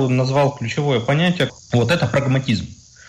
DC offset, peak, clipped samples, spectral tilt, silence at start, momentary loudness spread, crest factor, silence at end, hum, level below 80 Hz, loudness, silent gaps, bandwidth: under 0.1%; -6 dBFS; under 0.1%; -6.5 dB/octave; 0 s; 5 LU; 12 dB; 0.35 s; none; -48 dBFS; -19 LUFS; none; 11 kHz